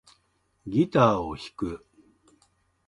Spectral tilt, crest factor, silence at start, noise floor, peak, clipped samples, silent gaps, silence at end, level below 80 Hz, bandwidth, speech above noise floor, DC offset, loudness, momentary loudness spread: -7.5 dB/octave; 22 dB; 0.65 s; -70 dBFS; -6 dBFS; under 0.1%; none; 1.1 s; -54 dBFS; 11.5 kHz; 45 dB; under 0.1%; -25 LUFS; 19 LU